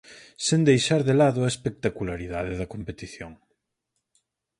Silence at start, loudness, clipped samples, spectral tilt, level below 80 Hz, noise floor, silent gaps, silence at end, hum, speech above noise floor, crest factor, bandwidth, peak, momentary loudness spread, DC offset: 0.1 s; -24 LUFS; under 0.1%; -5.5 dB/octave; -50 dBFS; -80 dBFS; none; 1.25 s; none; 56 dB; 20 dB; 11.5 kHz; -6 dBFS; 18 LU; under 0.1%